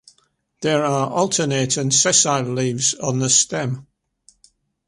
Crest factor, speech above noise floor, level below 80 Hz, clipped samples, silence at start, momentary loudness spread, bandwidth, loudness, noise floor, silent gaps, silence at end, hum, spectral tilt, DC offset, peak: 18 dB; 45 dB; -60 dBFS; under 0.1%; 0.6 s; 10 LU; 11.5 kHz; -18 LUFS; -64 dBFS; none; 1.05 s; none; -3 dB/octave; under 0.1%; -2 dBFS